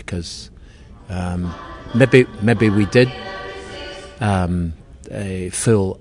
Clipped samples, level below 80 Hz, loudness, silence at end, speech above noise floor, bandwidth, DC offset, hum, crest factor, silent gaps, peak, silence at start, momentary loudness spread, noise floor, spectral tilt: under 0.1%; -42 dBFS; -18 LUFS; 0 s; 24 dB; 11 kHz; under 0.1%; none; 20 dB; none; 0 dBFS; 0 s; 19 LU; -41 dBFS; -6 dB/octave